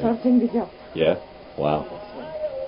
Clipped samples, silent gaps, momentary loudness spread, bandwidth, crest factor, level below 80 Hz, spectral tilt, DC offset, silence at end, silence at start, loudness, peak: under 0.1%; none; 16 LU; 5.4 kHz; 18 dB; -52 dBFS; -11.5 dB/octave; under 0.1%; 0 s; 0 s; -24 LUFS; -6 dBFS